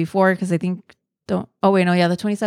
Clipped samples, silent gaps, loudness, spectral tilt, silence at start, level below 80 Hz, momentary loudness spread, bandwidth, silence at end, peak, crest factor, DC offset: under 0.1%; none; -19 LUFS; -7 dB/octave; 0 s; -62 dBFS; 10 LU; 12 kHz; 0 s; -4 dBFS; 16 dB; under 0.1%